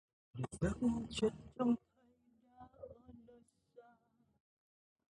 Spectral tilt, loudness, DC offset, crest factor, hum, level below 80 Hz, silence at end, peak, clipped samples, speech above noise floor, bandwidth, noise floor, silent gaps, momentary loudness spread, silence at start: -6.5 dB/octave; -39 LUFS; under 0.1%; 20 dB; none; -60 dBFS; 1.3 s; -22 dBFS; under 0.1%; 37 dB; 11 kHz; -74 dBFS; none; 23 LU; 0.35 s